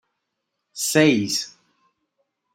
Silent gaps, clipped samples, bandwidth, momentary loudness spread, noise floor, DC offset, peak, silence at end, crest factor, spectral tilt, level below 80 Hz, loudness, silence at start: none; under 0.1%; 16 kHz; 19 LU; -79 dBFS; under 0.1%; -4 dBFS; 1.05 s; 20 dB; -3.5 dB/octave; -68 dBFS; -20 LUFS; 0.75 s